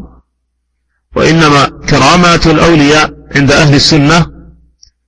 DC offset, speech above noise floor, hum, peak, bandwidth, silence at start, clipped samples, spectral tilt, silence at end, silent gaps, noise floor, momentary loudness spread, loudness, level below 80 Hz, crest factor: under 0.1%; 58 dB; none; 0 dBFS; 11 kHz; 0 s; 0.8%; -5 dB/octave; 0.75 s; none; -64 dBFS; 6 LU; -7 LUFS; -28 dBFS; 8 dB